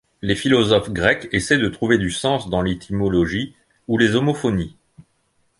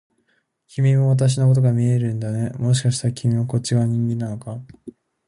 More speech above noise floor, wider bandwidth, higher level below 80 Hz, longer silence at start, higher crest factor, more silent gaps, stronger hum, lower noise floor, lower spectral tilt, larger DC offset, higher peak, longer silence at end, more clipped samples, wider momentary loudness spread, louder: about the same, 46 dB vs 48 dB; about the same, 11.5 kHz vs 11 kHz; first, -42 dBFS vs -54 dBFS; second, 0.25 s vs 0.75 s; first, 20 dB vs 12 dB; neither; neither; about the same, -65 dBFS vs -67 dBFS; second, -5.5 dB/octave vs -7 dB/octave; neither; first, 0 dBFS vs -6 dBFS; first, 0.6 s vs 0.35 s; neither; second, 8 LU vs 12 LU; about the same, -19 LUFS vs -20 LUFS